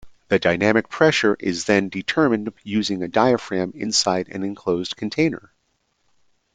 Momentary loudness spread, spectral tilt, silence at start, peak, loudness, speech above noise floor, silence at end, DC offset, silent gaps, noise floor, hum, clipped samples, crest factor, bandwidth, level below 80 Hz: 8 LU; -4 dB/octave; 0.05 s; -2 dBFS; -21 LUFS; 49 dB; 1.15 s; under 0.1%; none; -69 dBFS; none; under 0.1%; 20 dB; 9.4 kHz; -58 dBFS